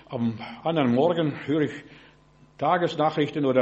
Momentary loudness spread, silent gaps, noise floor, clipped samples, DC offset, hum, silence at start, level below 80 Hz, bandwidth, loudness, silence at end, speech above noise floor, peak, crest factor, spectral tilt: 8 LU; none; -56 dBFS; under 0.1%; under 0.1%; none; 0.1 s; -64 dBFS; 8 kHz; -25 LUFS; 0 s; 32 dB; -8 dBFS; 18 dB; -7.5 dB/octave